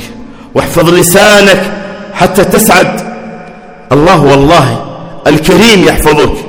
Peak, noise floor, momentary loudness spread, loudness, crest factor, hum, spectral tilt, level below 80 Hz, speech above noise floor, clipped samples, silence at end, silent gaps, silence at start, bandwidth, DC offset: 0 dBFS; -28 dBFS; 17 LU; -6 LUFS; 6 dB; none; -4.5 dB/octave; -26 dBFS; 23 dB; 10%; 0 s; none; 0 s; over 20 kHz; under 0.1%